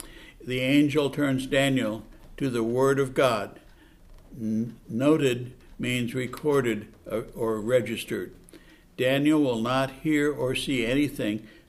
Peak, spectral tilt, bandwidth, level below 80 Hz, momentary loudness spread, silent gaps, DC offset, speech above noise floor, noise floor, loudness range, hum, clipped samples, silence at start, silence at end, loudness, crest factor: -10 dBFS; -5.5 dB/octave; 14.5 kHz; -52 dBFS; 11 LU; none; under 0.1%; 27 dB; -52 dBFS; 4 LU; none; under 0.1%; 0 s; 0.2 s; -26 LUFS; 18 dB